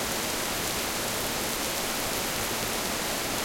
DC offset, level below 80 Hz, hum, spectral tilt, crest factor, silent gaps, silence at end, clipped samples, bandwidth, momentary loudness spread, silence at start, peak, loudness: under 0.1%; -48 dBFS; none; -2 dB/octave; 18 dB; none; 0 s; under 0.1%; 17 kHz; 0 LU; 0 s; -12 dBFS; -28 LUFS